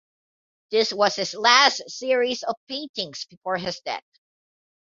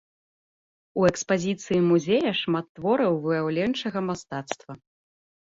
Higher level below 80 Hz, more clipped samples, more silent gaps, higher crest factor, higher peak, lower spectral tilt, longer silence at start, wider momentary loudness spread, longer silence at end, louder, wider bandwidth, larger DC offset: second, -70 dBFS vs -62 dBFS; neither; first, 2.57-2.67 s, 2.89-2.94 s, 3.37-3.41 s vs 2.69-2.75 s; first, 24 dB vs 18 dB; first, 0 dBFS vs -8 dBFS; second, -1.5 dB/octave vs -5.5 dB/octave; second, 0.7 s vs 0.95 s; first, 16 LU vs 12 LU; first, 0.85 s vs 0.65 s; first, -22 LUFS vs -25 LUFS; about the same, 7.6 kHz vs 8 kHz; neither